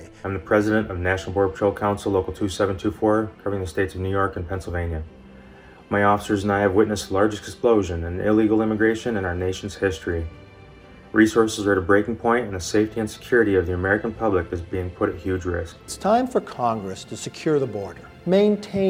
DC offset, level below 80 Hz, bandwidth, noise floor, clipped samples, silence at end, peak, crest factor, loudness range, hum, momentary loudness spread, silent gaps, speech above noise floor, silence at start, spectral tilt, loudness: under 0.1%; -44 dBFS; 15.5 kHz; -46 dBFS; under 0.1%; 0 s; -4 dBFS; 18 dB; 4 LU; none; 11 LU; none; 24 dB; 0 s; -6 dB/octave; -22 LUFS